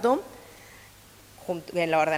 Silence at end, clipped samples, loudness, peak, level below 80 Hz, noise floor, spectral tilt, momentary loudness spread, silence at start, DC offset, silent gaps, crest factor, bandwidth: 0 s; under 0.1%; -28 LUFS; -10 dBFS; -62 dBFS; -52 dBFS; -5 dB/octave; 25 LU; 0 s; under 0.1%; none; 18 dB; 16 kHz